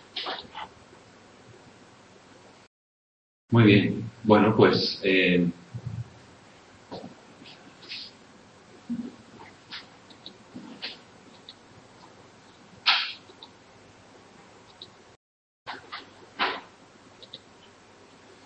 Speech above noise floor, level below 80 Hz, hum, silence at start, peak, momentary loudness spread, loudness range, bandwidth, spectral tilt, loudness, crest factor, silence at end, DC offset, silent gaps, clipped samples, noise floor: 33 dB; -64 dBFS; none; 0.15 s; -4 dBFS; 28 LU; 21 LU; 8.6 kHz; -6.5 dB/octave; -24 LUFS; 26 dB; 1.1 s; under 0.1%; 2.67-3.48 s, 15.16-15.66 s; under 0.1%; -53 dBFS